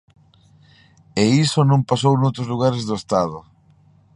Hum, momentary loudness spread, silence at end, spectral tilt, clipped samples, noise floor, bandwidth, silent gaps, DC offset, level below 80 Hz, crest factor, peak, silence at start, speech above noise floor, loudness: none; 10 LU; 0.75 s; -6.5 dB/octave; under 0.1%; -53 dBFS; 11 kHz; none; under 0.1%; -54 dBFS; 18 dB; -2 dBFS; 1.15 s; 36 dB; -19 LUFS